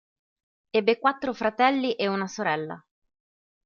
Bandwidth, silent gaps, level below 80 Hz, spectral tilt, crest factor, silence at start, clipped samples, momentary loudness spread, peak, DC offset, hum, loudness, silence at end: 7.2 kHz; none; -70 dBFS; -5 dB/octave; 22 dB; 0.75 s; under 0.1%; 8 LU; -6 dBFS; under 0.1%; none; -25 LUFS; 0.85 s